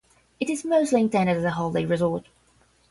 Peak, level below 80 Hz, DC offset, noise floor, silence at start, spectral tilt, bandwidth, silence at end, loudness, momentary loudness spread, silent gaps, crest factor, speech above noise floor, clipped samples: -8 dBFS; -58 dBFS; under 0.1%; -61 dBFS; 0.4 s; -6 dB/octave; 11.5 kHz; 0.7 s; -24 LUFS; 8 LU; none; 16 dB; 38 dB; under 0.1%